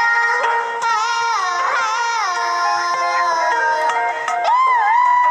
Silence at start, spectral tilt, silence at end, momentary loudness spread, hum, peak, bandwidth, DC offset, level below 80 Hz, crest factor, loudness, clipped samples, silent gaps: 0 s; 1 dB/octave; 0 s; 5 LU; none; -4 dBFS; 12 kHz; under 0.1%; -70 dBFS; 12 dB; -17 LUFS; under 0.1%; none